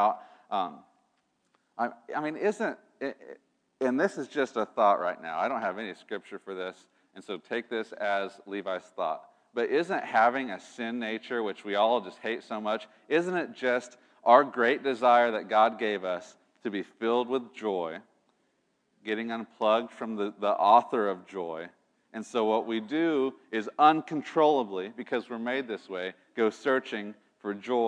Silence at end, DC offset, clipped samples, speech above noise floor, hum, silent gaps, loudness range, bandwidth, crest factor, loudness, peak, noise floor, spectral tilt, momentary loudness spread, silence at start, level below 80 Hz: 0 s; under 0.1%; under 0.1%; 45 dB; none; none; 8 LU; 10 kHz; 24 dB; -29 LUFS; -6 dBFS; -74 dBFS; -5 dB/octave; 15 LU; 0 s; -90 dBFS